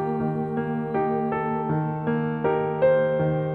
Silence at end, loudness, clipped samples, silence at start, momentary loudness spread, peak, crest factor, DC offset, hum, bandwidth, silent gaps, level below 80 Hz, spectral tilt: 0 s; -24 LUFS; under 0.1%; 0 s; 6 LU; -10 dBFS; 14 dB; under 0.1%; none; 4.2 kHz; none; -58 dBFS; -11 dB/octave